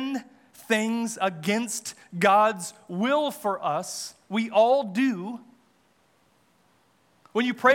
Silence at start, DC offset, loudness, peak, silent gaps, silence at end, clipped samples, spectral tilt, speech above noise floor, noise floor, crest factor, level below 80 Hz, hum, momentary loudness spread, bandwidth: 0 s; under 0.1%; -25 LUFS; -6 dBFS; none; 0 s; under 0.1%; -4 dB/octave; 40 dB; -65 dBFS; 20 dB; -84 dBFS; none; 14 LU; 18 kHz